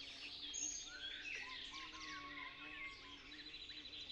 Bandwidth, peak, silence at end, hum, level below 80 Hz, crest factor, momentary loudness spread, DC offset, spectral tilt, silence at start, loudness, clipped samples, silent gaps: 13 kHz; -34 dBFS; 0 s; none; -70 dBFS; 18 dB; 8 LU; under 0.1%; 0.5 dB/octave; 0 s; -48 LUFS; under 0.1%; none